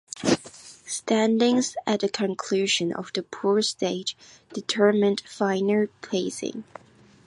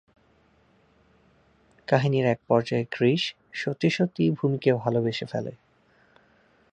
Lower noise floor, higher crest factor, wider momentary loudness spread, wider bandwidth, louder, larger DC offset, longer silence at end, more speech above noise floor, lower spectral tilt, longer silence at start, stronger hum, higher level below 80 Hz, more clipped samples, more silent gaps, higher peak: second, -46 dBFS vs -62 dBFS; about the same, 18 dB vs 22 dB; first, 13 LU vs 9 LU; first, 11.5 kHz vs 8.8 kHz; about the same, -25 LUFS vs -25 LUFS; neither; second, 0.65 s vs 1.2 s; second, 22 dB vs 38 dB; second, -4 dB/octave vs -7 dB/octave; second, 0.15 s vs 1.9 s; neither; about the same, -68 dBFS vs -66 dBFS; neither; neither; about the same, -6 dBFS vs -4 dBFS